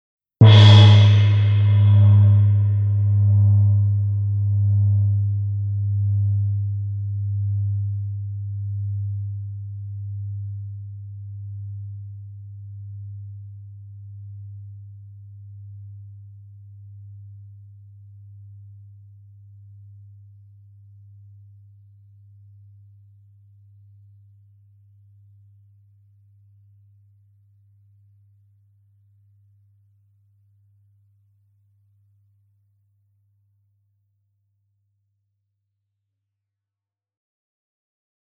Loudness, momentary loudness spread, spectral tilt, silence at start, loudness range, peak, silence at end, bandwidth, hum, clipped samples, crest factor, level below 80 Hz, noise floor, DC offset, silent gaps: -18 LUFS; 27 LU; -7.5 dB/octave; 0.4 s; 28 LU; 0 dBFS; 21 s; 6.2 kHz; none; under 0.1%; 22 dB; -56 dBFS; -89 dBFS; under 0.1%; none